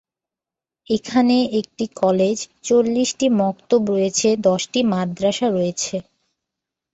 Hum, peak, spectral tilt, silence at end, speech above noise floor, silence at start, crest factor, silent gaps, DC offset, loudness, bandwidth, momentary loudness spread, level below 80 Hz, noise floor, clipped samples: none; -4 dBFS; -4.5 dB/octave; 0.9 s; 70 dB; 0.9 s; 16 dB; none; under 0.1%; -19 LUFS; 8.2 kHz; 8 LU; -60 dBFS; -89 dBFS; under 0.1%